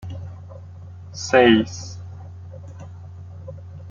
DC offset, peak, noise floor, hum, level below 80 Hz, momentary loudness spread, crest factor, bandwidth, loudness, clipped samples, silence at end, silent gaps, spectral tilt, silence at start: under 0.1%; -2 dBFS; -38 dBFS; none; -56 dBFS; 24 LU; 22 dB; 7.6 kHz; -17 LUFS; under 0.1%; 0 s; none; -5 dB/octave; 0.05 s